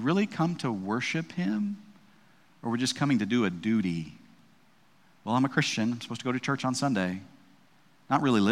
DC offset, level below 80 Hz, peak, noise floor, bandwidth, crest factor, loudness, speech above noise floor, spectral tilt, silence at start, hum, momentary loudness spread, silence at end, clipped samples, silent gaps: under 0.1%; -72 dBFS; -10 dBFS; -63 dBFS; 13.5 kHz; 20 dB; -29 LUFS; 35 dB; -5.5 dB/octave; 0 s; none; 9 LU; 0 s; under 0.1%; none